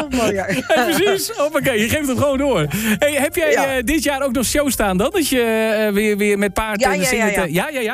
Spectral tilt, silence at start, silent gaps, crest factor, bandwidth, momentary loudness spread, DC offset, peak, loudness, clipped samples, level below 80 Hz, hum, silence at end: -4 dB/octave; 0 s; none; 12 dB; 16 kHz; 3 LU; under 0.1%; -4 dBFS; -17 LUFS; under 0.1%; -38 dBFS; none; 0 s